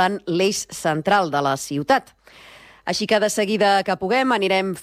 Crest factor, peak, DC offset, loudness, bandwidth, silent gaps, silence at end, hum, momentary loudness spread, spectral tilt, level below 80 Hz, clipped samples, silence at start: 14 dB; -6 dBFS; under 0.1%; -20 LUFS; 16 kHz; none; 0 s; none; 6 LU; -4 dB/octave; -60 dBFS; under 0.1%; 0 s